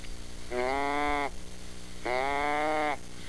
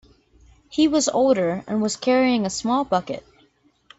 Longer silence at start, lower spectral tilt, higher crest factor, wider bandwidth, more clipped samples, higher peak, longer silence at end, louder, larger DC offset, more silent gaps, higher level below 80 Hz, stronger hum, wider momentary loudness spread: second, 0 s vs 0.7 s; about the same, -4 dB/octave vs -4 dB/octave; about the same, 16 dB vs 16 dB; first, 11 kHz vs 8.4 kHz; neither; second, -16 dBFS vs -6 dBFS; second, 0 s vs 0.8 s; second, -31 LUFS vs -21 LUFS; first, 1% vs under 0.1%; neither; first, -46 dBFS vs -56 dBFS; first, 60 Hz at -50 dBFS vs none; first, 17 LU vs 8 LU